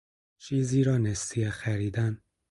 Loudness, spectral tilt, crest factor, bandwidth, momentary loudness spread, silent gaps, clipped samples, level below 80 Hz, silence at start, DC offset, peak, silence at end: -28 LUFS; -6 dB/octave; 16 dB; 11.5 kHz; 7 LU; none; under 0.1%; -52 dBFS; 0.4 s; under 0.1%; -14 dBFS; 0.35 s